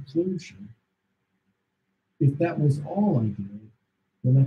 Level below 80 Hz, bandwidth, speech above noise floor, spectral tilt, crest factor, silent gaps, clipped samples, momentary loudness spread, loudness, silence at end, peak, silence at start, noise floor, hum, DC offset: -66 dBFS; 7.2 kHz; 52 dB; -9.5 dB/octave; 16 dB; none; under 0.1%; 15 LU; -25 LUFS; 0 s; -10 dBFS; 0 s; -77 dBFS; none; under 0.1%